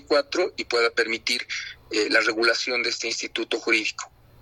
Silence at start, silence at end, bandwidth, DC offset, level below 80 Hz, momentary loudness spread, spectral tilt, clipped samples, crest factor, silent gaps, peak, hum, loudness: 0.1 s; 0.35 s; 13.5 kHz; under 0.1%; -62 dBFS; 9 LU; -1 dB/octave; under 0.1%; 18 dB; none; -6 dBFS; none; -23 LUFS